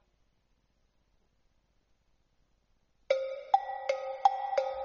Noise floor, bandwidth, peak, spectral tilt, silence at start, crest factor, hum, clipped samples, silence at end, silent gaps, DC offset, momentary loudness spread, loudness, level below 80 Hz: -73 dBFS; 7 kHz; -12 dBFS; 2 dB/octave; 3.1 s; 24 dB; none; under 0.1%; 0 s; none; under 0.1%; 6 LU; -32 LUFS; -72 dBFS